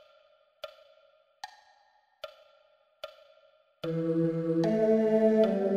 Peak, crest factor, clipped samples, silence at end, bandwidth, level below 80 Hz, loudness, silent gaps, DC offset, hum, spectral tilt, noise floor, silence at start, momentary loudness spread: -12 dBFS; 18 dB; under 0.1%; 0 s; 8.6 kHz; -76 dBFS; -27 LUFS; none; under 0.1%; none; -8.5 dB/octave; -67 dBFS; 0.65 s; 23 LU